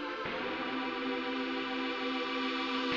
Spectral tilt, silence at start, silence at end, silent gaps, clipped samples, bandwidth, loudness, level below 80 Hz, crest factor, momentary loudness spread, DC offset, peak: -4 dB/octave; 0 s; 0 s; none; under 0.1%; 7.6 kHz; -35 LUFS; -70 dBFS; 14 dB; 3 LU; under 0.1%; -22 dBFS